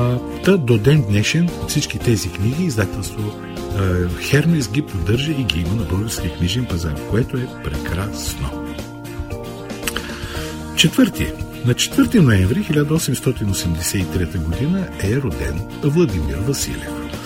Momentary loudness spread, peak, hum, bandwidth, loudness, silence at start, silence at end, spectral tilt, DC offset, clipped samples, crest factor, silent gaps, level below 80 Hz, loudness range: 12 LU; 0 dBFS; none; 16.5 kHz; -19 LUFS; 0 s; 0 s; -5 dB/octave; under 0.1%; under 0.1%; 18 dB; none; -32 dBFS; 6 LU